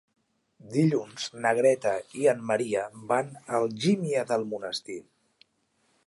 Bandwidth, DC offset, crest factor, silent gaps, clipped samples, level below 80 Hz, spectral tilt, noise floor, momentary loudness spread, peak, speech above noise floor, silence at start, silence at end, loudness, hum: 11.5 kHz; under 0.1%; 18 dB; none; under 0.1%; -74 dBFS; -5.5 dB/octave; -71 dBFS; 10 LU; -10 dBFS; 45 dB; 0.65 s; 1.05 s; -27 LUFS; none